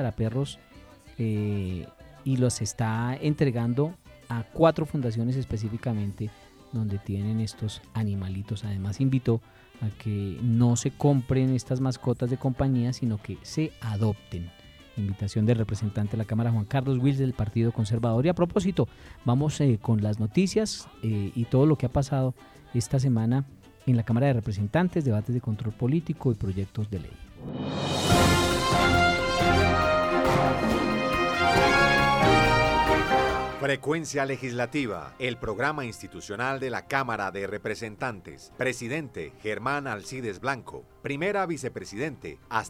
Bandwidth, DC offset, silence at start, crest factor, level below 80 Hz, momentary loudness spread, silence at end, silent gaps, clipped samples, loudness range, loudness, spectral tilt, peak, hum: 16 kHz; under 0.1%; 0 s; 18 dB; -44 dBFS; 12 LU; 0 s; none; under 0.1%; 9 LU; -26 LUFS; -6 dB/octave; -8 dBFS; none